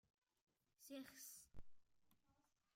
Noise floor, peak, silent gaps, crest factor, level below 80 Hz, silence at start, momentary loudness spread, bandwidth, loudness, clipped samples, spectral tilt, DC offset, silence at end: -84 dBFS; -42 dBFS; none; 18 dB; -76 dBFS; 0.8 s; 11 LU; 16.5 kHz; -59 LUFS; under 0.1%; -3 dB/octave; under 0.1%; 0.45 s